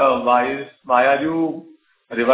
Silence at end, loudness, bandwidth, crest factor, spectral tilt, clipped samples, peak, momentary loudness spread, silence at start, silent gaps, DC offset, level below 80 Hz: 0 s; -19 LUFS; 4 kHz; 16 dB; -9 dB/octave; under 0.1%; -2 dBFS; 13 LU; 0 s; none; under 0.1%; -60 dBFS